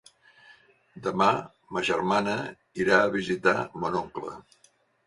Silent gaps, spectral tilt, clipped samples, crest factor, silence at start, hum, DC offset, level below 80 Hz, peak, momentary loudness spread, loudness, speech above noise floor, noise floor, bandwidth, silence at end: none; -5 dB/octave; under 0.1%; 24 dB; 0.95 s; none; under 0.1%; -62 dBFS; -4 dBFS; 15 LU; -26 LUFS; 38 dB; -64 dBFS; 11.5 kHz; 0.65 s